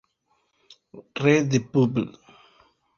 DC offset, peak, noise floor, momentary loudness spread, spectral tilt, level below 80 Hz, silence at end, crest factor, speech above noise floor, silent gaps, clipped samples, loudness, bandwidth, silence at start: under 0.1%; -4 dBFS; -70 dBFS; 14 LU; -6.5 dB/octave; -62 dBFS; 0.85 s; 22 dB; 48 dB; none; under 0.1%; -23 LUFS; 7.2 kHz; 0.95 s